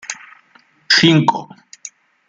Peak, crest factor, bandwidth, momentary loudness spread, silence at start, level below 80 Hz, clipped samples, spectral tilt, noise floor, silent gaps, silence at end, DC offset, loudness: 0 dBFS; 18 dB; 9.4 kHz; 25 LU; 0.1 s; -62 dBFS; under 0.1%; -4 dB/octave; -53 dBFS; none; 0.4 s; under 0.1%; -13 LUFS